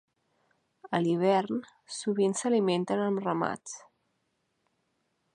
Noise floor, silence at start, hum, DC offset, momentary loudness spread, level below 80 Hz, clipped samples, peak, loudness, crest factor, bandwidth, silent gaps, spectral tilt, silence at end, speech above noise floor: -77 dBFS; 0.85 s; none; under 0.1%; 13 LU; -78 dBFS; under 0.1%; -12 dBFS; -29 LUFS; 20 dB; 11.5 kHz; none; -5.5 dB/octave; 1.55 s; 49 dB